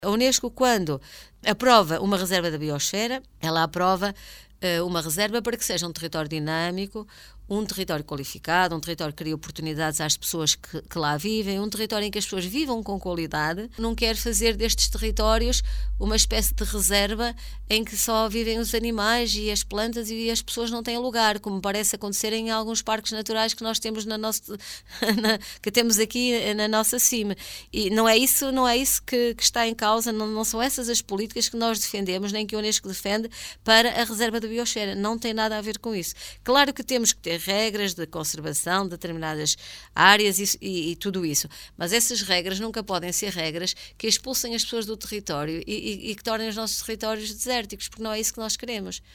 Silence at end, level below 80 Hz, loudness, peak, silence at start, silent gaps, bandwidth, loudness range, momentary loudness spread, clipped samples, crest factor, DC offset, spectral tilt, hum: 0.15 s; -38 dBFS; -24 LUFS; 0 dBFS; 0 s; none; 17.5 kHz; 6 LU; 10 LU; under 0.1%; 26 dB; under 0.1%; -2.5 dB/octave; none